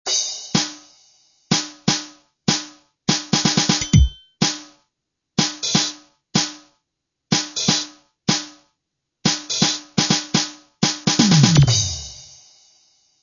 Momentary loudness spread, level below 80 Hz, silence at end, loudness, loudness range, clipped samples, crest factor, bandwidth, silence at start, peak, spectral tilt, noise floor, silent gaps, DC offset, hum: 12 LU; -34 dBFS; 1 s; -19 LUFS; 5 LU; under 0.1%; 22 dB; 7.4 kHz; 0.05 s; 0 dBFS; -3.5 dB/octave; -79 dBFS; none; under 0.1%; none